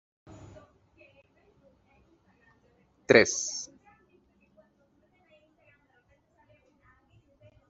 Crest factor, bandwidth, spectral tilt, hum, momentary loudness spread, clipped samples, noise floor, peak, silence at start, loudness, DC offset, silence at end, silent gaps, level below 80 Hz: 30 dB; 8 kHz; -3 dB/octave; none; 31 LU; under 0.1%; -68 dBFS; -4 dBFS; 3.1 s; -24 LUFS; under 0.1%; 4.05 s; none; -68 dBFS